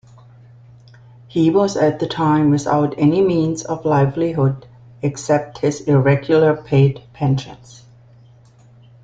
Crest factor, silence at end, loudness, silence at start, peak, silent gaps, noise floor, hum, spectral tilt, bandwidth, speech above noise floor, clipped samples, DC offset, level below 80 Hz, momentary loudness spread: 16 dB; 1.5 s; -17 LUFS; 1.35 s; -2 dBFS; none; -47 dBFS; none; -7 dB/octave; 7.8 kHz; 31 dB; under 0.1%; under 0.1%; -50 dBFS; 8 LU